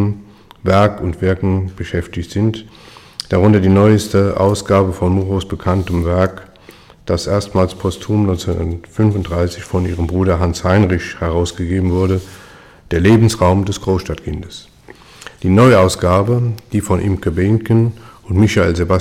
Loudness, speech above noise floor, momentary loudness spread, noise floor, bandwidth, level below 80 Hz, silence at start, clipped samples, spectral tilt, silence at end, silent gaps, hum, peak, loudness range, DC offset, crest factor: -15 LUFS; 28 dB; 12 LU; -42 dBFS; 14.5 kHz; -34 dBFS; 0 s; under 0.1%; -7 dB/octave; 0 s; none; none; 0 dBFS; 4 LU; under 0.1%; 14 dB